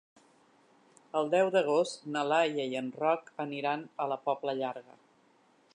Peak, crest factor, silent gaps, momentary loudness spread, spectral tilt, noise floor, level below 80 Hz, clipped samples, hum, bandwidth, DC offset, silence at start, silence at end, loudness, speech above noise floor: -14 dBFS; 18 dB; none; 9 LU; -4.5 dB/octave; -66 dBFS; -88 dBFS; under 0.1%; none; 10.5 kHz; under 0.1%; 1.15 s; 0.95 s; -31 LUFS; 35 dB